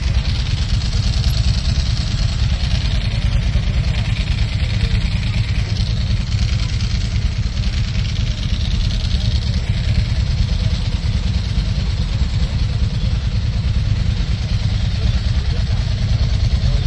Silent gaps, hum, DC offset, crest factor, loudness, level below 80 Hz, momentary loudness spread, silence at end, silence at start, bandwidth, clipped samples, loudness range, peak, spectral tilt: none; none; under 0.1%; 12 dB; -19 LUFS; -20 dBFS; 2 LU; 0 s; 0 s; 12 kHz; under 0.1%; 1 LU; -4 dBFS; -5.5 dB/octave